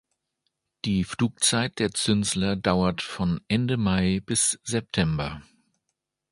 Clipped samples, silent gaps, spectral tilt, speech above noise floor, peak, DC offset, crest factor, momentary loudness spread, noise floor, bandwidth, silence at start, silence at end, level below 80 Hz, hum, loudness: under 0.1%; none; -4 dB/octave; 56 dB; -4 dBFS; under 0.1%; 22 dB; 6 LU; -81 dBFS; 11.5 kHz; 0.85 s; 0.9 s; -46 dBFS; none; -25 LUFS